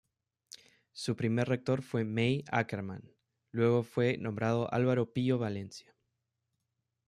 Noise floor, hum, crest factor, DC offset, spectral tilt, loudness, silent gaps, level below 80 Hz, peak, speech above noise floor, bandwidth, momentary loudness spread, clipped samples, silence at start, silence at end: -84 dBFS; none; 20 dB; under 0.1%; -7 dB/octave; -32 LUFS; none; -70 dBFS; -14 dBFS; 53 dB; 11.5 kHz; 21 LU; under 0.1%; 0.95 s; 1.3 s